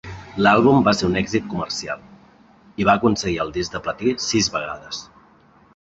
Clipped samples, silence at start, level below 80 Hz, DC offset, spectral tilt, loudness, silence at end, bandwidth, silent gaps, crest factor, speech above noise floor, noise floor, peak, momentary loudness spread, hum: under 0.1%; 0.05 s; -46 dBFS; under 0.1%; -4.5 dB/octave; -20 LUFS; 0.8 s; 8.2 kHz; none; 20 dB; 33 dB; -53 dBFS; -2 dBFS; 17 LU; none